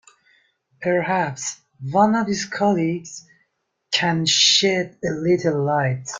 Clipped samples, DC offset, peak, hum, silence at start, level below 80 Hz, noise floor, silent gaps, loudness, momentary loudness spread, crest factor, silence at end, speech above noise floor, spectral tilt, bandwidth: under 0.1%; under 0.1%; -2 dBFS; none; 0.8 s; -60 dBFS; -72 dBFS; none; -20 LUFS; 15 LU; 18 dB; 0 s; 52 dB; -3.5 dB/octave; 9.8 kHz